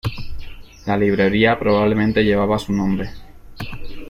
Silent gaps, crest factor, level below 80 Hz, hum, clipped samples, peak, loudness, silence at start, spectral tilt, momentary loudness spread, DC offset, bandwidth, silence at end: none; 16 dB; -36 dBFS; none; under 0.1%; -2 dBFS; -18 LUFS; 0.05 s; -7 dB/octave; 18 LU; under 0.1%; 13.5 kHz; 0 s